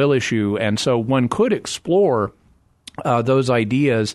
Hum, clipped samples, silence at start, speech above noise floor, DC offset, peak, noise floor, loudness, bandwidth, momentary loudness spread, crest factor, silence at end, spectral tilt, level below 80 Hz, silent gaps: none; under 0.1%; 0 s; 39 dB; under 0.1%; -6 dBFS; -56 dBFS; -19 LUFS; 12.5 kHz; 6 LU; 14 dB; 0 s; -6 dB/octave; -54 dBFS; none